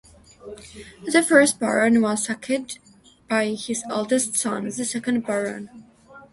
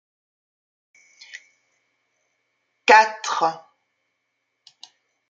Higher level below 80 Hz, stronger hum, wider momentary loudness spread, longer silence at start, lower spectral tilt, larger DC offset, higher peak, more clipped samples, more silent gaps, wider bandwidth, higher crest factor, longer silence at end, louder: first, -62 dBFS vs -78 dBFS; neither; second, 23 LU vs 27 LU; second, 0.45 s vs 1.35 s; first, -3 dB/octave vs -1 dB/octave; neither; about the same, -2 dBFS vs -2 dBFS; neither; neither; first, 12 kHz vs 7.8 kHz; about the same, 22 dB vs 24 dB; second, 0.1 s vs 1.7 s; second, -22 LUFS vs -18 LUFS